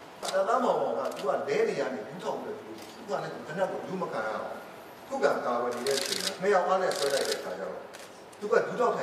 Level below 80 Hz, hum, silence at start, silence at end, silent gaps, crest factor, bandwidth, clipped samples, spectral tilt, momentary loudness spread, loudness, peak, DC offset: -76 dBFS; none; 0 s; 0 s; none; 20 dB; 15.5 kHz; under 0.1%; -3 dB/octave; 15 LU; -30 LUFS; -10 dBFS; under 0.1%